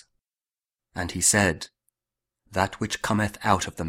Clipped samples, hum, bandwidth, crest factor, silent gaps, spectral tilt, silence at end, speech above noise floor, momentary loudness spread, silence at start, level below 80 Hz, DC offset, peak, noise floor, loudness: under 0.1%; none; 16 kHz; 24 dB; none; -3.5 dB/octave; 0 s; over 65 dB; 16 LU; 0.95 s; -50 dBFS; under 0.1%; -4 dBFS; under -90 dBFS; -24 LUFS